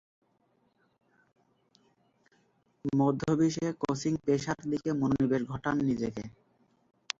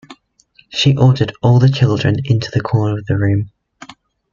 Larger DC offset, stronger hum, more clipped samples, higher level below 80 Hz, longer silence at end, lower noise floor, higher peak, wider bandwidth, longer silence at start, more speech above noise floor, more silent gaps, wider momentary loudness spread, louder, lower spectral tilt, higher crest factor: neither; neither; neither; second, -62 dBFS vs -44 dBFS; about the same, 0.9 s vs 0.85 s; first, -72 dBFS vs -52 dBFS; second, -8 dBFS vs -2 dBFS; about the same, 7.8 kHz vs 7.4 kHz; first, 2.85 s vs 0.1 s; about the same, 42 dB vs 39 dB; neither; about the same, 7 LU vs 7 LU; second, -30 LUFS vs -15 LUFS; about the same, -6.5 dB/octave vs -7 dB/octave; first, 24 dB vs 14 dB